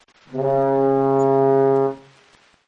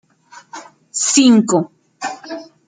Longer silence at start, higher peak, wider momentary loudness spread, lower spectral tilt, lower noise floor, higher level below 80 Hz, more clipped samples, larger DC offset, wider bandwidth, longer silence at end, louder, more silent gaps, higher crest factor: about the same, 0.3 s vs 0.35 s; second, -6 dBFS vs 0 dBFS; second, 10 LU vs 25 LU; first, -9 dB/octave vs -3.5 dB/octave; first, -55 dBFS vs -45 dBFS; about the same, -60 dBFS vs -64 dBFS; neither; neither; second, 7.2 kHz vs 9.6 kHz; first, 0.7 s vs 0.25 s; second, -18 LUFS vs -14 LUFS; neither; about the same, 14 dB vs 16 dB